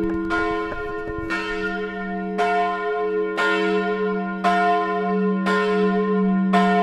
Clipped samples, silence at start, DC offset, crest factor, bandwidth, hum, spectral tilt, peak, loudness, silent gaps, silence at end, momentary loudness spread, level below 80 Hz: under 0.1%; 0 s; under 0.1%; 14 dB; 9.6 kHz; none; -7 dB/octave; -6 dBFS; -22 LUFS; none; 0 s; 8 LU; -46 dBFS